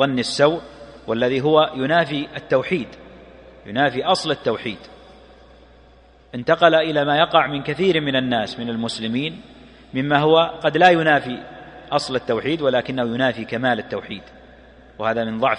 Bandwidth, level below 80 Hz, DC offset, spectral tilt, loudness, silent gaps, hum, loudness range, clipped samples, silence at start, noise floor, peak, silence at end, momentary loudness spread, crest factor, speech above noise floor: 10.5 kHz; -54 dBFS; under 0.1%; -5.5 dB/octave; -20 LUFS; none; none; 5 LU; under 0.1%; 0 s; -50 dBFS; 0 dBFS; 0 s; 15 LU; 20 dB; 30 dB